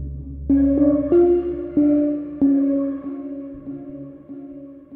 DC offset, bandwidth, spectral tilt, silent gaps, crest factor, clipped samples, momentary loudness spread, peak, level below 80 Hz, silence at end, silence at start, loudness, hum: under 0.1%; 2.9 kHz; -13 dB/octave; none; 14 dB; under 0.1%; 21 LU; -6 dBFS; -38 dBFS; 0 s; 0 s; -19 LUFS; none